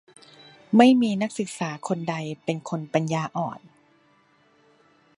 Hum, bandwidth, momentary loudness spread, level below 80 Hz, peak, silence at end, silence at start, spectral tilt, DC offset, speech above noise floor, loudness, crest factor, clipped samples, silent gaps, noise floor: none; 11.5 kHz; 14 LU; -74 dBFS; -2 dBFS; 1.6 s; 0.7 s; -6 dB/octave; under 0.1%; 38 dB; -24 LUFS; 22 dB; under 0.1%; none; -61 dBFS